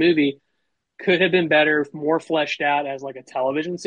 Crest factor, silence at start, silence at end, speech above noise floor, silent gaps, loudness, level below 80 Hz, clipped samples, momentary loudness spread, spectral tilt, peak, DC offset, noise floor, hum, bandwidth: 16 dB; 0 s; 0 s; 55 dB; none; -20 LUFS; -68 dBFS; under 0.1%; 11 LU; -5.5 dB/octave; -6 dBFS; under 0.1%; -75 dBFS; none; 9.4 kHz